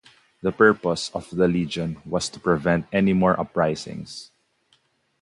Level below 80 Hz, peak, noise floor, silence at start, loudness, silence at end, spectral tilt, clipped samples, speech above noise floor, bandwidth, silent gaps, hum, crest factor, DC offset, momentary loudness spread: -50 dBFS; -2 dBFS; -65 dBFS; 0.45 s; -22 LUFS; 0.95 s; -6 dB/octave; under 0.1%; 43 dB; 11.5 kHz; none; none; 20 dB; under 0.1%; 13 LU